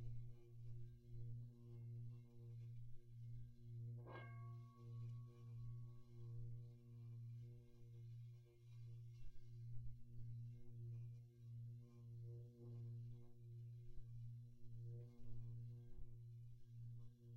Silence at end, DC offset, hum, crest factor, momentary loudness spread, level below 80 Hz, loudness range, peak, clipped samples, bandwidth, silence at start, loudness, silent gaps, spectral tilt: 0 s; under 0.1%; none; 16 dB; 6 LU; -66 dBFS; 2 LU; -38 dBFS; under 0.1%; 6 kHz; 0 s; -58 LUFS; none; -9 dB/octave